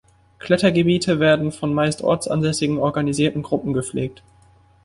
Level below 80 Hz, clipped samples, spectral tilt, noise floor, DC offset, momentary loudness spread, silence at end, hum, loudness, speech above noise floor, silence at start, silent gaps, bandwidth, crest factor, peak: -50 dBFS; under 0.1%; -5.5 dB/octave; -53 dBFS; under 0.1%; 8 LU; 0.75 s; none; -20 LUFS; 34 dB; 0.45 s; none; 11.5 kHz; 18 dB; -2 dBFS